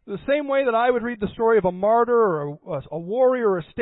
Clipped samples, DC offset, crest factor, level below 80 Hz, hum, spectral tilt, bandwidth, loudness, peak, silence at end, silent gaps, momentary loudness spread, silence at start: under 0.1%; under 0.1%; 12 dB; -54 dBFS; none; -11 dB/octave; 4.1 kHz; -21 LUFS; -8 dBFS; 0 s; none; 10 LU; 0.05 s